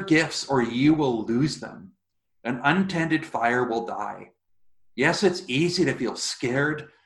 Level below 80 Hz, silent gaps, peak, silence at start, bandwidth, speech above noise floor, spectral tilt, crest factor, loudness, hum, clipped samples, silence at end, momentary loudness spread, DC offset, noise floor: -60 dBFS; none; -4 dBFS; 0 s; 12 kHz; 40 dB; -5 dB/octave; 22 dB; -24 LUFS; none; under 0.1%; 0.2 s; 12 LU; under 0.1%; -64 dBFS